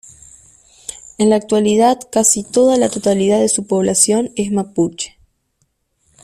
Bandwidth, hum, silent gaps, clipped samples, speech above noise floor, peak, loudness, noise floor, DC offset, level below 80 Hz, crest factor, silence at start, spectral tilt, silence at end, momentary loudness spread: 15 kHz; none; none; under 0.1%; 51 dB; 0 dBFS; -14 LUFS; -65 dBFS; under 0.1%; -54 dBFS; 16 dB; 0.9 s; -4 dB/octave; 1.15 s; 15 LU